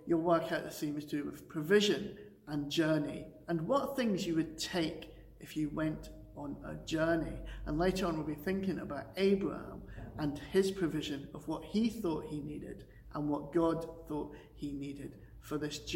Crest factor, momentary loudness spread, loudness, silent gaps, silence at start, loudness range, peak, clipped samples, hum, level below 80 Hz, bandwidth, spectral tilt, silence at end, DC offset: 20 dB; 15 LU; -36 LUFS; none; 0 s; 4 LU; -16 dBFS; under 0.1%; none; -54 dBFS; 16.5 kHz; -5.5 dB/octave; 0 s; under 0.1%